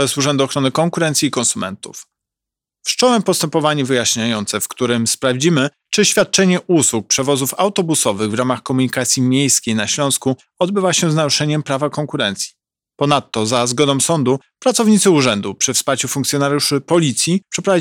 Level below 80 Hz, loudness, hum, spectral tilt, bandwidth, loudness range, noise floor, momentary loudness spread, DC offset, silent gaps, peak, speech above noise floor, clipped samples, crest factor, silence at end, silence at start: -60 dBFS; -16 LUFS; none; -3.5 dB/octave; 18.5 kHz; 3 LU; -86 dBFS; 6 LU; under 0.1%; none; -2 dBFS; 69 dB; under 0.1%; 14 dB; 0 s; 0 s